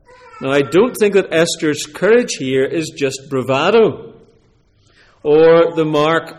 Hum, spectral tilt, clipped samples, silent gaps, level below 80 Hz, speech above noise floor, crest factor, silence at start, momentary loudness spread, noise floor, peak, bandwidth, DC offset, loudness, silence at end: none; -4.5 dB/octave; under 0.1%; none; -54 dBFS; 40 dB; 12 dB; 0.35 s; 10 LU; -54 dBFS; -2 dBFS; 14.5 kHz; under 0.1%; -14 LUFS; 0.05 s